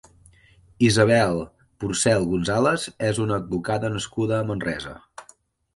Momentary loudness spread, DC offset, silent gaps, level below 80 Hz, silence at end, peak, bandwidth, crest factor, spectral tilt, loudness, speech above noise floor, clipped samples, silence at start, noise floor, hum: 13 LU; under 0.1%; none; -50 dBFS; 0.55 s; -4 dBFS; 11.5 kHz; 20 dB; -5 dB/octave; -23 LUFS; 34 dB; under 0.1%; 0.8 s; -56 dBFS; none